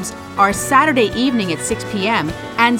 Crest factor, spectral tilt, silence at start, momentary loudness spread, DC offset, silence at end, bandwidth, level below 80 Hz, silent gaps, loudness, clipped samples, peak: 16 dB; -4 dB/octave; 0 s; 8 LU; under 0.1%; 0 s; 17 kHz; -42 dBFS; none; -16 LUFS; under 0.1%; 0 dBFS